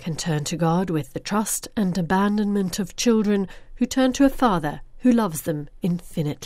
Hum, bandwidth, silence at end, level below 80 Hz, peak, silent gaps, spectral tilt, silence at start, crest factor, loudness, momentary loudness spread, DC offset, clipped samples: none; 16 kHz; 0 s; -42 dBFS; -4 dBFS; none; -5.5 dB/octave; 0 s; 18 dB; -23 LUFS; 8 LU; under 0.1%; under 0.1%